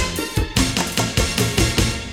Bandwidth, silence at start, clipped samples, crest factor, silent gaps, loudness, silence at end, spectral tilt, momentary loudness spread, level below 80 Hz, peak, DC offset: 19 kHz; 0 s; under 0.1%; 16 dB; none; -19 LUFS; 0 s; -3.5 dB/octave; 4 LU; -28 dBFS; -4 dBFS; 0.3%